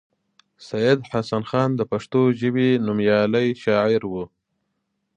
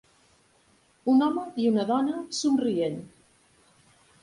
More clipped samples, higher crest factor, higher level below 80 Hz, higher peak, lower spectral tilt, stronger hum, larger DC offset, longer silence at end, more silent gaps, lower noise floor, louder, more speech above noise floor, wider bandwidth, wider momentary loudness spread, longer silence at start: neither; about the same, 18 dB vs 16 dB; first, -58 dBFS vs -70 dBFS; first, -4 dBFS vs -12 dBFS; first, -7.5 dB/octave vs -5 dB/octave; neither; neither; second, 0.9 s vs 1.15 s; neither; first, -75 dBFS vs -63 dBFS; first, -21 LUFS vs -26 LUFS; first, 54 dB vs 38 dB; second, 9.2 kHz vs 11.5 kHz; about the same, 7 LU vs 8 LU; second, 0.6 s vs 1.05 s